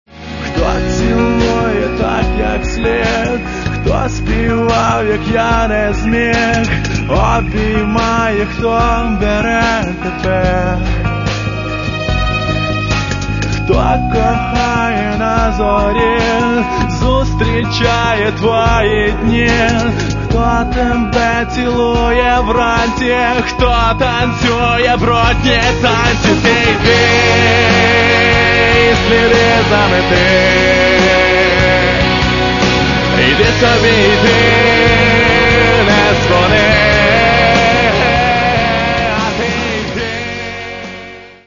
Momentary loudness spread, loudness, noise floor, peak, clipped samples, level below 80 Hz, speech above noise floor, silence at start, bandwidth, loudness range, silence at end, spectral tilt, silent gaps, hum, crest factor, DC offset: 8 LU; -11 LUFS; -31 dBFS; 0 dBFS; under 0.1%; -22 dBFS; 20 dB; 0.1 s; 7.4 kHz; 6 LU; 0.15 s; -5 dB/octave; none; none; 12 dB; under 0.1%